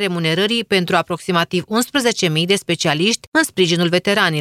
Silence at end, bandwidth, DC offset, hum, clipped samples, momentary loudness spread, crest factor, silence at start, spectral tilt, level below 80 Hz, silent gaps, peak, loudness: 0 s; 15.5 kHz; under 0.1%; none; under 0.1%; 3 LU; 16 dB; 0 s; -4 dB/octave; -58 dBFS; 3.27-3.32 s; 0 dBFS; -17 LUFS